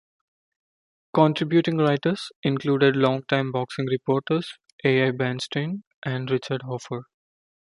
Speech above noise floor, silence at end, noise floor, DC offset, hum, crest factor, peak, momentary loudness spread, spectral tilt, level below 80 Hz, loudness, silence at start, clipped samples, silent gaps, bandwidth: over 67 dB; 0.75 s; under -90 dBFS; under 0.1%; none; 22 dB; -4 dBFS; 11 LU; -7 dB/octave; -68 dBFS; -24 LUFS; 1.15 s; under 0.1%; 2.36-2.43 s, 4.72-4.78 s, 5.87-6.02 s; 11.5 kHz